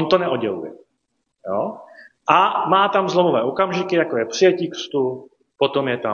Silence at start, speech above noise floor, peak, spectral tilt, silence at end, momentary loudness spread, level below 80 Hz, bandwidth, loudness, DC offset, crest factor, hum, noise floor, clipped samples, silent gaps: 0 s; 54 dB; 0 dBFS; -5 dB/octave; 0 s; 12 LU; -68 dBFS; 7.2 kHz; -19 LUFS; under 0.1%; 18 dB; none; -73 dBFS; under 0.1%; none